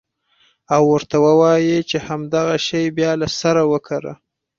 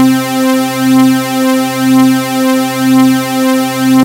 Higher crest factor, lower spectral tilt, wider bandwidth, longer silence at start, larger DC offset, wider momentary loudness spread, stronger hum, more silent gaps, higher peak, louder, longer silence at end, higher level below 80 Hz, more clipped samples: first, 16 dB vs 10 dB; about the same, -5.5 dB/octave vs -4.5 dB/octave; second, 7.6 kHz vs 16 kHz; first, 0.7 s vs 0 s; neither; first, 10 LU vs 3 LU; neither; neither; about the same, -2 dBFS vs 0 dBFS; second, -17 LUFS vs -10 LUFS; first, 0.45 s vs 0 s; about the same, -54 dBFS vs -54 dBFS; neither